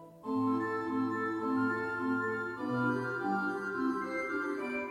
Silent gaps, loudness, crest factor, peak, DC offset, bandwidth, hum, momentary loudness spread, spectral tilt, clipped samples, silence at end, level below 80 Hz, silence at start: none; -34 LUFS; 14 dB; -20 dBFS; under 0.1%; 10.5 kHz; none; 3 LU; -7 dB/octave; under 0.1%; 0 s; -74 dBFS; 0 s